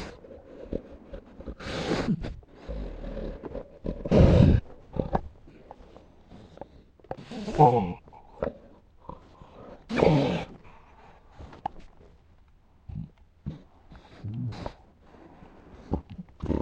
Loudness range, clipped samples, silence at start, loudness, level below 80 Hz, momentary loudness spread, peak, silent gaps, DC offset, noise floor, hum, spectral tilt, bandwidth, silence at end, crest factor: 16 LU; under 0.1%; 0 s; -27 LUFS; -38 dBFS; 27 LU; -4 dBFS; none; under 0.1%; -57 dBFS; none; -8 dB/octave; 8.8 kHz; 0 s; 26 dB